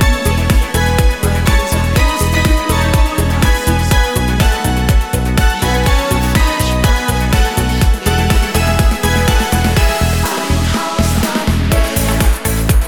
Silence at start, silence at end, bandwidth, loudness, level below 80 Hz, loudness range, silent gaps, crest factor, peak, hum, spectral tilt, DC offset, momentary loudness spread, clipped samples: 0 s; 0 s; 19 kHz; -14 LUFS; -16 dBFS; 1 LU; none; 12 dB; 0 dBFS; none; -5 dB/octave; 0.8%; 2 LU; under 0.1%